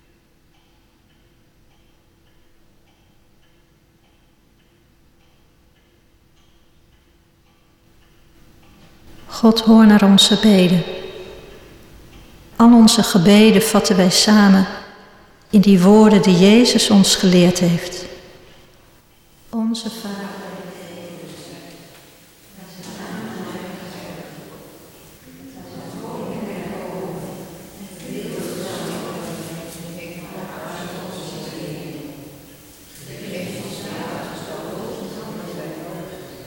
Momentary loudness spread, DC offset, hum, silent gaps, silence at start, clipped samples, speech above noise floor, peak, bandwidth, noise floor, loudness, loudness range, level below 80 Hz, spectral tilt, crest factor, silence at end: 25 LU; under 0.1%; none; none; 9.3 s; under 0.1%; 44 dB; -2 dBFS; 17 kHz; -55 dBFS; -14 LUFS; 21 LU; -50 dBFS; -5 dB/octave; 16 dB; 0.1 s